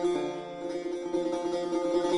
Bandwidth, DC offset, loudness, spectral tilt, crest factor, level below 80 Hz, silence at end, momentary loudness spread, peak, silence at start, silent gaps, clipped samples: 11 kHz; under 0.1%; -32 LUFS; -5 dB/octave; 14 dB; -66 dBFS; 0 s; 7 LU; -16 dBFS; 0 s; none; under 0.1%